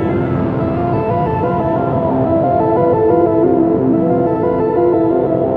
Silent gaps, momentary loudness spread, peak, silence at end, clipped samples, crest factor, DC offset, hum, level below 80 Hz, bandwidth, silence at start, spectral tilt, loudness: none; 4 LU; -2 dBFS; 0 s; under 0.1%; 12 dB; under 0.1%; none; -38 dBFS; 4.5 kHz; 0 s; -11.5 dB/octave; -14 LUFS